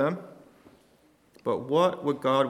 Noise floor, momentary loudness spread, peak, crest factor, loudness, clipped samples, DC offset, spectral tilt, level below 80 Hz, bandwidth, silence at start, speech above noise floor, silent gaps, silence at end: -62 dBFS; 14 LU; -10 dBFS; 18 dB; -27 LUFS; under 0.1%; under 0.1%; -6.5 dB/octave; -72 dBFS; 13.5 kHz; 0 s; 37 dB; none; 0 s